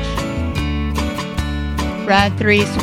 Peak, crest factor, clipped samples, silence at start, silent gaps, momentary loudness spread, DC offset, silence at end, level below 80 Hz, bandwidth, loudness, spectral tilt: 0 dBFS; 18 dB; under 0.1%; 0 s; none; 8 LU; under 0.1%; 0 s; -26 dBFS; 16 kHz; -18 LUFS; -5.5 dB/octave